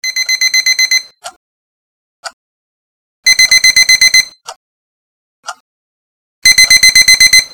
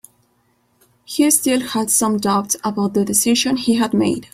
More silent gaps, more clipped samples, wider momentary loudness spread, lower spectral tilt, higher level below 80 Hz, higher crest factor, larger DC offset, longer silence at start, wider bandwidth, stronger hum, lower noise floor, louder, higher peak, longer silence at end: first, 1.36-2.23 s, 2.33-3.23 s, 4.56-5.43 s, 5.60-6.42 s vs none; neither; first, 9 LU vs 5 LU; second, 3.5 dB/octave vs -3.5 dB/octave; first, -44 dBFS vs -56 dBFS; second, 12 dB vs 18 dB; neither; second, 0.05 s vs 1.1 s; first, over 20 kHz vs 16 kHz; neither; first, under -90 dBFS vs -62 dBFS; first, -5 LUFS vs -17 LUFS; about the same, 0 dBFS vs 0 dBFS; about the same, 0.05 s vs 0.1 s